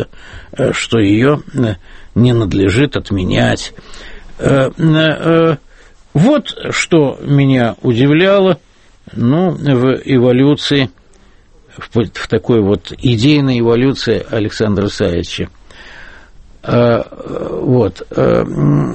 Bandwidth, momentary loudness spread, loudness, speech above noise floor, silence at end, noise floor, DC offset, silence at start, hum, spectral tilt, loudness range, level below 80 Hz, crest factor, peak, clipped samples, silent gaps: 8.8 kHz; 11 LU; -13 LUFS; 32 dB; 0 s; -44 dBFS; under 0.1%; 0 s; none; -6.5 dB/octave; 4 LU; -36 dBFS; 14 dB; 0 dBFS; under 0.1%; none